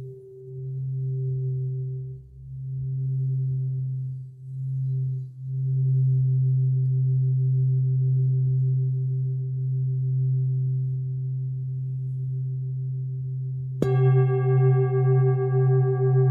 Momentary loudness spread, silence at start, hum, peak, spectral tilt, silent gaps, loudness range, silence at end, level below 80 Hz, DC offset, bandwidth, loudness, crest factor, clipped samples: 12 LU; 0 s; none; -6 dBFS; -12 dB/octave; none; 7 LU; 0 s; -60 dBFS; under 0.1%; 2.3 kHz; -25 LUFS; 16 dB; under 0.1%